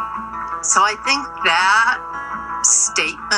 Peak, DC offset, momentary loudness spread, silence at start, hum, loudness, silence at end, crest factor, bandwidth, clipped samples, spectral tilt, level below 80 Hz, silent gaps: 0 dBFS; under 0.1%; 13 LU; 0 s; none; -16 LUFS; 0 s; 18 dB; 12 kHz; under 0.1%; 1 dB/octave; -50 dBFS; none